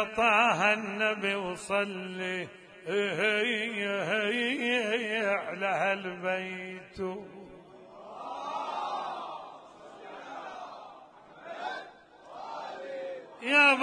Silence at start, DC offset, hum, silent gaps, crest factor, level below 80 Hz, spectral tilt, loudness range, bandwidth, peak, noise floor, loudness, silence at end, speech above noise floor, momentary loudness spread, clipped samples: 0 s; under 0.1%; none; none; 22 dB; -70 dBFS; -4 dB/octave; 13 LU; 10.5 kHz; -10 dBFS; -52 dBFS; -29 LUFS; 0 s; 23 dB; 22 LU; under 0.1%